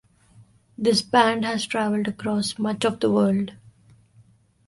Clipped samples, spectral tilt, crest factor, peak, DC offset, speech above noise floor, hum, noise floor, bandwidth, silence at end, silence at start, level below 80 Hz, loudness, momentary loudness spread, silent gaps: under 0.1%; -5 dB/octave; 20 dB; -4 dBFS; under 0.1%; 34 dB; none; -56 dBFS; 11.5 kHz; 1.15 s; 0.4 s; -62 dBFS; -23 LUFS; 7 LU; none